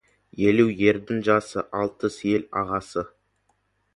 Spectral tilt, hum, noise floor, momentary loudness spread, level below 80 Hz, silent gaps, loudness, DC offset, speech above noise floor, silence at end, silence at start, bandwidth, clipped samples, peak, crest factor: -6.5 dB/octave; none; -70 dBFS; 12 LU; -56 dBFS; none; -24 LUFS; under 0.1%; 47 dB; 0.9 s; 0.35 s; 11.5 kHz; under 0.1%; -4 dBFS; 20 dB